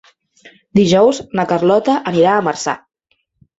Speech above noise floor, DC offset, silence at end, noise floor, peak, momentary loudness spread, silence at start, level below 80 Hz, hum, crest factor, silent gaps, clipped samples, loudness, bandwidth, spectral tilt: 52 dB; under 0.1%; 0.85 s; -66 dBFS; -2 dBFS; 9 LU; 0.45 s; -52 dBFS; none; 14 dB; none; under 0.1%; -14 LUFS; 8 kHz; -5.5 dB/octave